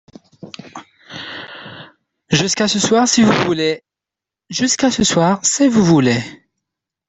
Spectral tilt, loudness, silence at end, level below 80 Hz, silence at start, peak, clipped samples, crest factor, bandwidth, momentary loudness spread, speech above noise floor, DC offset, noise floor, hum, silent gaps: -4 dB/octave; -14 LUFS; 0.75 s; -52 dBFS; 0.45 s; -2 dBFS; under 0.1%; 16 dB; 8.4 kHz; 21 LU; 72 dB; under 0.1%; -86 dBFS; none; none